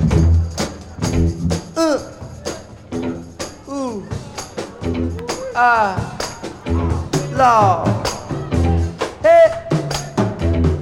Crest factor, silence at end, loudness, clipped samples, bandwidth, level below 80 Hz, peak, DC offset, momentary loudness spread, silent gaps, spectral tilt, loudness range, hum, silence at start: 16 dB; 0 s; -18 LUFS; under 0.1%; 15.5 kHz; -28 dBFS; -2 dBFS; under 0.1%; 16 LU; none; -6 dB/octave; 9 LU; none; 0 s